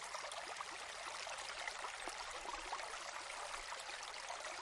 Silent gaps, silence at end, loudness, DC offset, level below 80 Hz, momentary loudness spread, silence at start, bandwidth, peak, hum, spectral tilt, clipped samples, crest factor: none; 0 s; -46 LUFS; under 0.1%; -70 dBFS; 2 LU; 0 s; 11.5 kHz; -28 dBFS; none; 0.5 dB/octave; under 0.1%; 18 dB